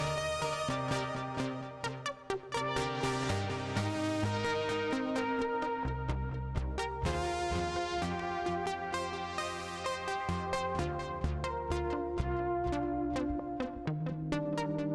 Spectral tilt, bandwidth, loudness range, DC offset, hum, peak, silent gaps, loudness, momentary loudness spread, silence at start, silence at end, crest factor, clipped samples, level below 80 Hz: -5.5 dB/octave; 13 kHz; 2 LU; under 0.1%; none; -20 dBFS; none; -35 LUFS; 4 LU; 0 s; 0 s; 14 dB; under 0.1%; -46 dBFS